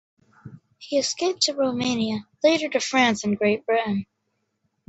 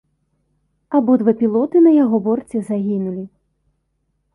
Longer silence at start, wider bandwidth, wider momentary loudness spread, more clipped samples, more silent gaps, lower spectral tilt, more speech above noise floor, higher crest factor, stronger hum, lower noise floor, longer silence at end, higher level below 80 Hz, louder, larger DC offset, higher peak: second, 0.45 s vs 0.9 s; second, 8.2 kHz vs 11 kHz; second, 7 LU vs 12 LU; neither; neither; second, -3.5 dB/octave vs -10 dB/octave; about the same, 52 dB vs 53 dB; about the same, 20 dB vs 16 dB; neither; first, -75 dBFS vs -69 dBFS; second, 0.85 s vs 1.05 s; about the same, -64 dBFS vs -62 dBFS; second, -23 LUFS vs -16 LUFS; neither; about the same, -4 dBFS vs -2 dBFS